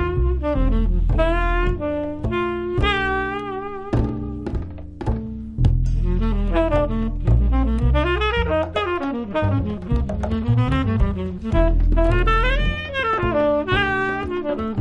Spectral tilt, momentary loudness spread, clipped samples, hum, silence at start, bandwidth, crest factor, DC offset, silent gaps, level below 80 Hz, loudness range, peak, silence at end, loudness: -8 dB/octave; 7 LU; under 0.1%; none; 0 s; 6.2 kHz; 16 dB; under 0.1%; none; -22 dBFS; 4 LU; -4 dBFS; 0 s; -22 LUFS